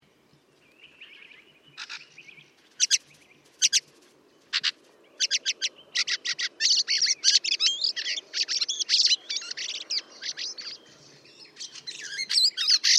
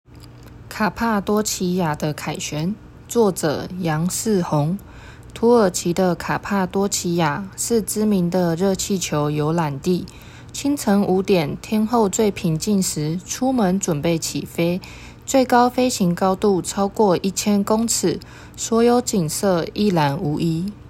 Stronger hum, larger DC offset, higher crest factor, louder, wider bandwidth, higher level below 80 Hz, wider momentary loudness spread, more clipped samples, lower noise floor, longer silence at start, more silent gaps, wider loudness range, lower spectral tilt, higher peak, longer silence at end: neither; neither; first, 22 dB vs 16 dB; second, -24 LUFS vs -20 LUFS; about the same, 16 kHz vs 16.5 kHz; second, -88 dBFS vs -46 dBFS; first, 18 LU vs 8 LU; neither; first, -62 dBFS vs -41 dBFS; first, 0.85 s vs 0.1 s; neither; first, 8 LU vs 3 LU; second, 4 dB/octave vs -5 dB/octave; about the same, -6 dBFS vs -4 dBFS; about the same, 0 s vs 0 s